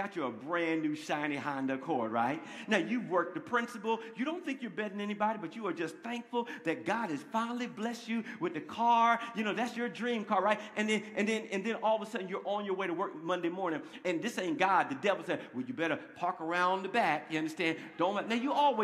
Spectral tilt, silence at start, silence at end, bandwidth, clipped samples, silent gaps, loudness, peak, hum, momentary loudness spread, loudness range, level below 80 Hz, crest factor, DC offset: -5 dB/octave; 0 s; 0 s; 14 kHz; under 0.1%; none; -34 LUFS; -12 dBFS; none; 8 LU; 4 LU; -84 dBFS; 22 dB; under 0.1%